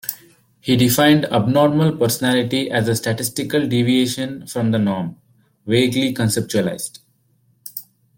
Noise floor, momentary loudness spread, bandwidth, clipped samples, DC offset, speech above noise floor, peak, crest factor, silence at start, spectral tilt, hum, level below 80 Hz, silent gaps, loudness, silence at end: -60 dBFS; 16 LU; 17 kHz; under 0.1%; under 0.1%; 43 dB; -2 dBFS; 16 dB; 0.05 s; -5 dB/octave; none; -54 dBFS; none; -18 LUFS; 0.35 s